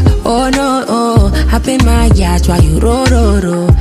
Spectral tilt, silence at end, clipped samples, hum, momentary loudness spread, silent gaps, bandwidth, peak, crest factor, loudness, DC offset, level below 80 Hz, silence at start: -6 dB/octave; 0 s; 0.2%; none; 3 LU; none; 14.5 kHz; 0 dBFS; 8 dB; -11 LUFS; under 0.1%; -12 dBFS; 0 s